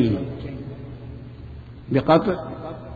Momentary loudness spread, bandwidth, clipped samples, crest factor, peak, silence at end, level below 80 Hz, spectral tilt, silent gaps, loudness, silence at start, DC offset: 21 LU; 7 kHz; under 0.1%; 22 dB; -2 dBFS; 0 s; -44 dBFS; -9.5 dB/octave; none; -23 LUFS; 0 s; under 0.1%